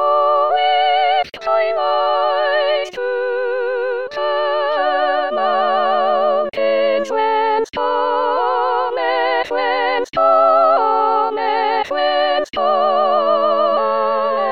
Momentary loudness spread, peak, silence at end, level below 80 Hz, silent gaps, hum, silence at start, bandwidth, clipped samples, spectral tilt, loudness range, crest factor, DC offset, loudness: 5 LU; -2 dBFS; 0 s; -60 dBFS; none; none; 0 s; 7.4 kHz; under 0.1%; -3.5 dB/octave; 3 LU; 14 dB; 0.9%; -16 LUFS